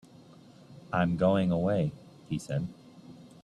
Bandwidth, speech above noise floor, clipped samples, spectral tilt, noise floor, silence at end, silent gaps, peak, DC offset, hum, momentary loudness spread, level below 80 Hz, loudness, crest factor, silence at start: 11 kHz; 26 dB; under 0.1%; -7.5 dB/octave; -54 dBFS; 0.15 s; none; -12 dBFS; under 0.1%; none; 23 LU; -60 dBFS; -30 LUFS; 18 dB; 0.7 s